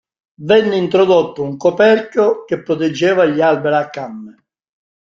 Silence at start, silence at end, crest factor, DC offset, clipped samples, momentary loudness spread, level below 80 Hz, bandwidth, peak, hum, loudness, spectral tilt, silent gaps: 0.4 s; 0.75 s; 14 dB; under 0.1%; under 0.1%; 13 LU; -58 dBFS; 7.6 kHz; -2 dBFS; none; -14 LUFS; -6 dB/octave; none